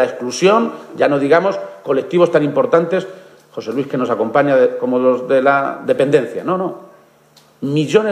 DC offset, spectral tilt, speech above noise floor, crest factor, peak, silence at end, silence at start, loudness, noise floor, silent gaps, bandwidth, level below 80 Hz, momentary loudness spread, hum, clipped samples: under 0.1%; -6 dB/octave; 35 dB; 16 dB; 0 dBFS; 0 s; 0 s; -16 LUFS; -50 dBFS; none; 11 kHz; -66 dBFS; 10 LU; none; under 0.1%